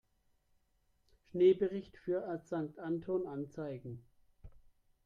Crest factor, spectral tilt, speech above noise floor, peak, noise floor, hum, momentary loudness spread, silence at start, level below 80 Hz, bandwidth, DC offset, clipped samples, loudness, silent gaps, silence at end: 20 dB; -8.5 dB/octave; 40 dB; -18 dBFS; -75 dBFS; none; 17 LU; 1.35 s; -68 dBFS; 7.2 kHz; under 0.1%; under 0.1%; -36 LUFS; none; 0.45 s